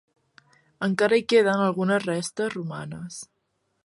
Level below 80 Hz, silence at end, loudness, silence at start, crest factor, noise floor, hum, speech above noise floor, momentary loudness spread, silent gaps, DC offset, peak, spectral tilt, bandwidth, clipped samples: -68 dBFS; 0.6 s; -24 LUFS; 0.8 s; 18 dB; -74 dBFS; none; 50 dB; 17 LU; none; under 0.1%; -8 dBFS; -5 dB/octave; 11.5 kHz; under 0.1%